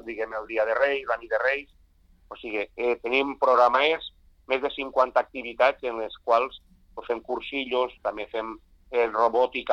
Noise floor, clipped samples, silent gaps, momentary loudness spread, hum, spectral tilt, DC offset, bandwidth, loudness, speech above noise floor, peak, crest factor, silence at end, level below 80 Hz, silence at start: -58 dBFS; under 0.1%; none; 11 LU; none; -4 dB/octave; under 0.1%; 7 kHz; -25 LUFS; 33 dB; -6 dBFS; 20 dB; 0 s; -58 dBFS; 0.05 s